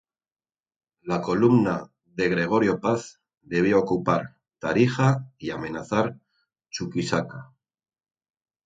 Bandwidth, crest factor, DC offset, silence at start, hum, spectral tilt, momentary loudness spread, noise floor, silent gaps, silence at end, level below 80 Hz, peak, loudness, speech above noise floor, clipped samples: 9.2 kHz; 20 dB; under 0.1%; 1.05 s; none; -6.5 dB/octave; 16 LU; under -90 dBFS; none; 1.2 s; -58 dBFS; -6 dBFS; -24 LUFS; over 67 dB; under 0.1%